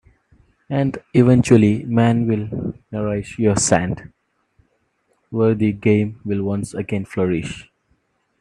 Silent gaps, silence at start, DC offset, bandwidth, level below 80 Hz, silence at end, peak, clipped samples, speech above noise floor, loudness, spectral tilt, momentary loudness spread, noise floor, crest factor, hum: none; 0.7 s; under 0.1%; 11.5 kHz; -48 dBFS; 0.8 s; 0 dBFS; under 0.1%; 48 dB; -19 LUFS; -6.5 dB/octave; 13 LU; -66 dBFS; 20 dB; none